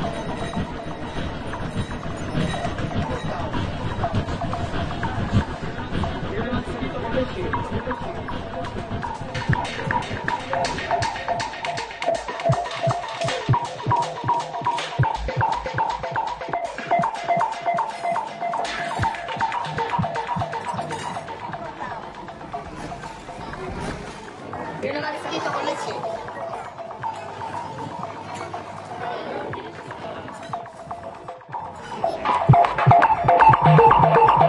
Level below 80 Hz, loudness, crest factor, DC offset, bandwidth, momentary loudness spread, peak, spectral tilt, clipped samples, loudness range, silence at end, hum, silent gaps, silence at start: -42 dBFS; -24 LUFS; 20 dB; under 0.1%; 11.5 kHz; 17 LU; -2 dBFS; -6 dB/octave; under 0.1%; 8 LU; 0 s; none; none; 0 s